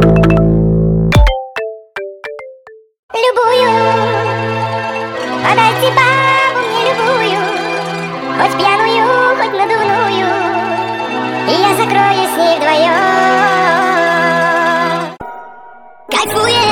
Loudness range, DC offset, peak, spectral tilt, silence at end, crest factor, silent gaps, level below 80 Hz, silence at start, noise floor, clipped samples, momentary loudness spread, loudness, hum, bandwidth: 4 LU; under 0.1%; 0 dBFS; -5 dB/octave; 0 s; 12 dB; 2.99-3.09 s; -26 dBFS; 0 s; -38 dBFS; under 0.1%; 10 LU; -12 LUFS; none; 18 kHz